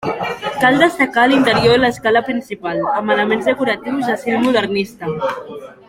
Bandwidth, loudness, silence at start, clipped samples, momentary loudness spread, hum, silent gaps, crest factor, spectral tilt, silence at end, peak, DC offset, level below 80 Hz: 16.5 kHz; -16 LUFS; 0 s; under 0.1%; 11 LU; none; none; 16 dB; -5 dB/octave; 0.15 s; 0 dBFS; under 0.1%; -48 dBFS